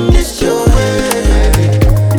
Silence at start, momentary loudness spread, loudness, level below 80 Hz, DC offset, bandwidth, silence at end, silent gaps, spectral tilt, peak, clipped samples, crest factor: 0 s; 2 LU; -11 LUFS; -12 dBFS; under 0.1%; 19.5 kHz; 0 s; none; -5.5 dB/octave; 0 dBFS; under 0.1%; 10 dB